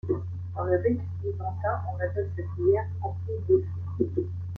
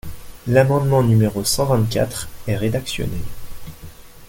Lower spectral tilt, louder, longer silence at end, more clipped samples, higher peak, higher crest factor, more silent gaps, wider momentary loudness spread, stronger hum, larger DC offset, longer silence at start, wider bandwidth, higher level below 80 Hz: first, -11.5 dB/octave vs -5.5 dB/octave; second, -29 LUFS vs -19 LUFS; about the same, 0 s vs 0.05 s; neither; second, -10 dBFS vs -2 dBFS; about the same, 18 dB vs 18 dB; neither; second, 8 LU vs 23 LU; neither; neither; about the same, 0.05 s vs 0.05 s; second, 2.4 kHz vs 17 kHz; second, -54 dBFS vs -38 dBFS